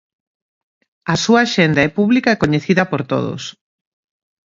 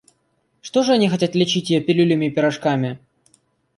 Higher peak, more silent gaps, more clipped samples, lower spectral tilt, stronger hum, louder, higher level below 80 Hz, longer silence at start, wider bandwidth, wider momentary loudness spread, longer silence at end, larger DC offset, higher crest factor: first, 0 dBFS vs -4 dBFS; neither; neither; about the same, -5.5 dB/octave vs -5.5 dB/octave; neither; first, -15 LUFS vs -19 LUFS; first, -50 dBFS vs -64 dBFS; first, 1.05 s vs 0.65 s; second, 7.8 kHz vs 11.5 kHz; first, 12 LU vs 8 LU; first, 1 s vs 0.8 s; neither; about the same, 18 dB vs 16 dB